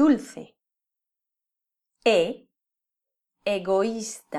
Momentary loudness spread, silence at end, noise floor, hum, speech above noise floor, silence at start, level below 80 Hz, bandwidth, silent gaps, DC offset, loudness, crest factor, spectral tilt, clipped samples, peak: 20 LU; 0 s; -87 dBFS; none; 63 dB; 0 s; -66 dBFS; 13 kHz; none; under 0.1%; -25 LUFS; 18 dB; -4.5 dB/octave; under 0.1%; -8 dBFS